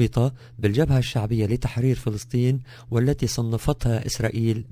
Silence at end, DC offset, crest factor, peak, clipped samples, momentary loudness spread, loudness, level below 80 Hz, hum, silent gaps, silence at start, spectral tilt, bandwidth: 0 s; under 0.1%; 16 dB; -6 dBFS; under 0.1%; 5 LU; -24 LUFS; -38 dBFS; none; none; 0 s; -6.5 dB/octave; 16 kHz